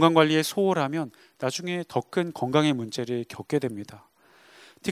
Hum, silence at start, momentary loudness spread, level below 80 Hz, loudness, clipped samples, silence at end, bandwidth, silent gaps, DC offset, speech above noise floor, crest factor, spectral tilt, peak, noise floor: none; 0 s; 12 LU; -70 dBFS; -26 LUFS; under 0.1%; 0 s; 16 kHz; none; under 0.1%; 30 dB; 22 dB; -5.5 dB/octave; -4 dBFS; -56 dBFS